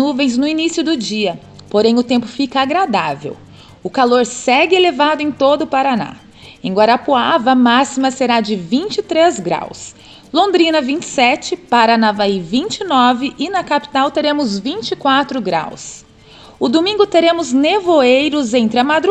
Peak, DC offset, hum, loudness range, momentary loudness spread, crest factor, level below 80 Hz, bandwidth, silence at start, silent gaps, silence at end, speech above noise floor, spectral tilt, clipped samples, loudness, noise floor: 0 dBFS; under 0.1%; none; 3 LU; 9 LU; 14 dB; -54 dBFS; 9.2 kHz; 0 s; none; 0 s; 27 dB; -4 dB/octave; under 0.1%; -14 LUFS; -41 dBFS